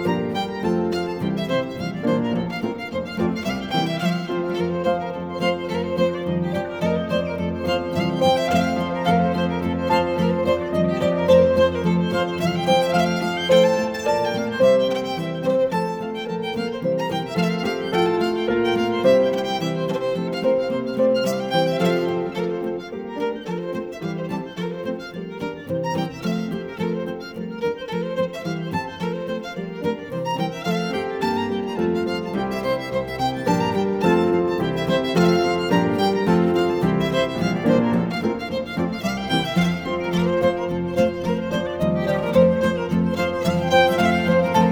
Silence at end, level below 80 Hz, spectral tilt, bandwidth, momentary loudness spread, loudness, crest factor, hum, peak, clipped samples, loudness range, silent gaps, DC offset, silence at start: 0 s; -50 dBFS; -6.5 dB/octave; 18.5 kHz; 10 LU; -22 LUFS; 16 dB; none; -4 dBFS; under 0.1%; 7 LU; none; under 0.1%; 0 s